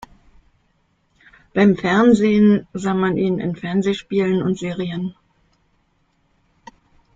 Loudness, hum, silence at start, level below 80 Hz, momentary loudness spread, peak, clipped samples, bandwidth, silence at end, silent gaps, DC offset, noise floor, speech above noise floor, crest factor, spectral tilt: -18 LUFS; none; 1.55 s; -54 dBFS; 11 LU; -2 dBFS; under 0.1%; 7.8 kHz; 2.05 s; none; under 0.1%; -64 dBFS; 46 dB; 18 dB; -7 dB/octave